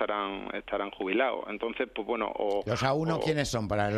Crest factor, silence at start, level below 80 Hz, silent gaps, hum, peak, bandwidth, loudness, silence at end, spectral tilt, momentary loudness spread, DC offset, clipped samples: 18 dB; 0 s; -54 dBFS; none; none; -12 dBFS; 13.5 kHz; -30 LUFS; 0 s; -5.5 dB/octave; 6 LU; under 0.1%; under 0.1%